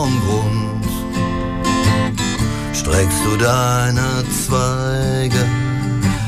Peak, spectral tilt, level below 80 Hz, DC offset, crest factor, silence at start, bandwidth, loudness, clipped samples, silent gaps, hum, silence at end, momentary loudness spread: -4 dBFS; -5 dB/octave; -30 dBFS; under 0.1%; 14 dB; 0 s; 16 kHz; -17 LUFS; under 0.1%; none; none; 0 s; 5 LU